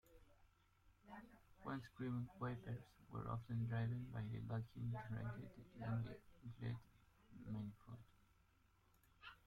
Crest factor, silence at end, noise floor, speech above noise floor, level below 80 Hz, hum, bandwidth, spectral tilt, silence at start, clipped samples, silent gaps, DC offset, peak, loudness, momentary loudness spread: 16 dB; 0.1 s; -76 dBFS; 28 dB; -70 dBFS; none; 5.2 kHz; -8.5 dB/octave; 0.1 s; under 0.1%; none; under 0.1%; -34 dBFS; -49 LUFS; 15 LU